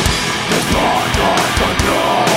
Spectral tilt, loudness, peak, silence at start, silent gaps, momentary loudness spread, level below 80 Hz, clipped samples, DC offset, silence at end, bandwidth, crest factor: -3.5 dB/octave; -14 LUFS; -2 dBFS; 0 s; none; 2 LU; -26 dBFS; under 0.1%; under 0.1%; 0 s; 16.5 kHz; 14 dB